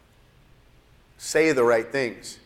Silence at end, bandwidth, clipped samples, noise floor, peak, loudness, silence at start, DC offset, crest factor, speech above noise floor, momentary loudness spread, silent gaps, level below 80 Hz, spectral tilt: 0.1 s; 15.5 kHz; under 0.1%; -56 dBFS; -8 dBFS; -22 LUFS; 1.2 s; under 0.1%; 18 dB; 34 dB; 11 LU; none; -58 dBFS; -4 dB/octave